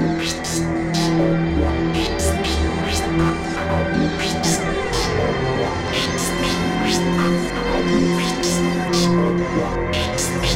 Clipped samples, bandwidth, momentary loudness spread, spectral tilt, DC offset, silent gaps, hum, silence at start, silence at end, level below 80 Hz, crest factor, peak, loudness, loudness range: under 0.1%; 16.5 kHz; 3 LU; -4.5 dB/octave; under 0.1%; none; none; 0 s; 0 s; -30 dBFS; 14 dB; -6 dBFS; -20 LUFS; 1 LU